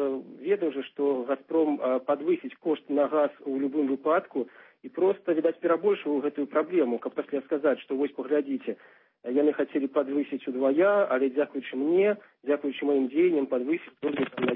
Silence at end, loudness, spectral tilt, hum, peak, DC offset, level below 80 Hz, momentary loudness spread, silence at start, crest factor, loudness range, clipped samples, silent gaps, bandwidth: 0 s; -27 LUFS; -10 dB/octave; none; -12 dBFS; under 0.1%; -80 dBFS; 8 LU; 0 s; 16 dB; 3 LU; under 0.1%; none; 4 kHz